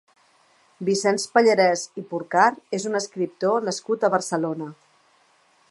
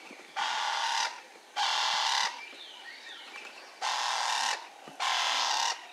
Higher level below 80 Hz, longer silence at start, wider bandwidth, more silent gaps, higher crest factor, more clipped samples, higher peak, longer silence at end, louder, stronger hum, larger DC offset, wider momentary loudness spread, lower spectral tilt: first, -78 dBFS vs under -90 dBFS; first, 0.8 s vs 0 s; second, 11.5 kHz vs 15.5 kHz; neither; about the same, 20 dB vs 18 dB; neither; first, -2 dBFS vs -16 dBFS; first, 1 s vs 0 s; first, -22 LUFS vs -30 LUFS; neither; neither; second, 12 LU vs 17 LU; first, -4 dB/octave vs 3 dB/octave